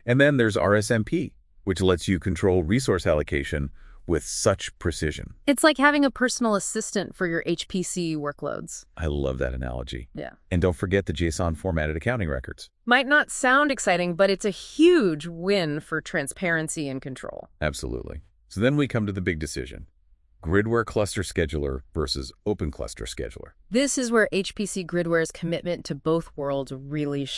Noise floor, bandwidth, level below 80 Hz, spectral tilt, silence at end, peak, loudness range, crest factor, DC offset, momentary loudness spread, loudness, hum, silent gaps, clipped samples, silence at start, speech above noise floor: -59 dBFS; 12 kHz; -42 dBFS; -5 dB/octave; 0 s; -4 dBFS; 6 LU; 20 dB; under 0.1%; 14 LU; -25 LUFS; none; none; under 0.1%; 0.05 s; 34 dB